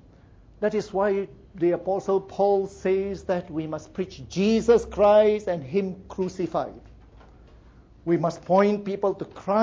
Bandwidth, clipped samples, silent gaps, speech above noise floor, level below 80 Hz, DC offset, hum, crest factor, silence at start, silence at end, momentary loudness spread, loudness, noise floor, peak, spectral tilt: 7.8 kHz; under 0.1%; none; 28 dB; -52 dBFS; under 0.1%; none; 18 dB; 0.6 s; 0 s; 13 LU; -24 LUFS; -52 dBFS; -8 dBFS; -7 dB/octave